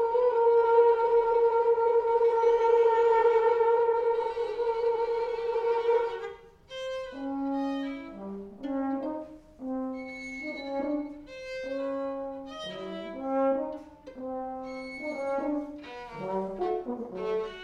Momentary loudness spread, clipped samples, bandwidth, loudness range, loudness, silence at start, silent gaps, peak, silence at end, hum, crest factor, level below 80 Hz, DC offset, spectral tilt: 17 LU; under 0.1%; 7 kHz; 12 LU; -28 LUFS; 0 s; none; -12 dBFS; 0 s; none; 16 dB; -60 dBFS; under 0.1%; -6 dB/octave